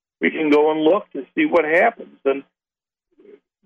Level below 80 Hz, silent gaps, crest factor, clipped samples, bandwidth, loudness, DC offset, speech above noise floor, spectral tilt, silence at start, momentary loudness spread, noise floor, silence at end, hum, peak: -68 dBFS; none; 16 dB; under 0.1%; 6.8 kHz; -19 LUFS; under 0.1%; over 72 dB; -6.5 dB/octave; 0.2 s; 9 LU; under -90 dBFS; 1.25 s; none; -4 dBFS